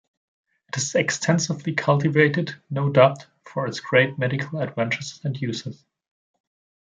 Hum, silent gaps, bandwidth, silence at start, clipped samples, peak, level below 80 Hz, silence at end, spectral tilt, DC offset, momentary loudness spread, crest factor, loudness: none; none; 9.4 kHz; 0.75 s; under 0.1%; -2 dBFS; -66 dBFS; 1.1 s; -5 dB/octave; under 0.1%; 12 LU; 22 dB; -22 LUFS